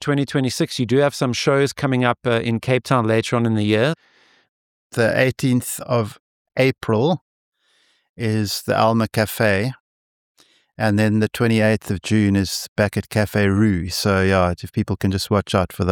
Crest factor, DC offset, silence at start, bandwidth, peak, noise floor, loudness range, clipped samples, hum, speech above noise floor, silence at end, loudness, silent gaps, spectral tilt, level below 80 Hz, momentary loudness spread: 16 dB; under 0.1%; 0 s; 17 kHz; -2 dBFS; -62 dBFS; 3 LU; under 0.1%; none; 43 dB; 0 s; -19 LUFS; 4.49-4.90 s, 6.20-6.45 s, 7.21-7.52 s, 8.09-8.16 s, 9.80-10.35 s, 12.68-12.76 s; -5.5 dB/octave; -48 dBFS; 5 LU